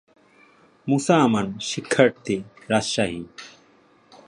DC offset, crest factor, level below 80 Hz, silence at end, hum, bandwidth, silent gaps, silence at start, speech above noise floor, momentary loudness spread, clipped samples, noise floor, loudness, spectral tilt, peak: under 0.1%; 22 dB; -58 dBFS; 0.8 s; none; 11.5 kHz; none; 0.85 s; 35 dB; 17 LU; under 0.1%; -57 dBFS; -22 LUFS; -5 dB/octave; -2 dBFS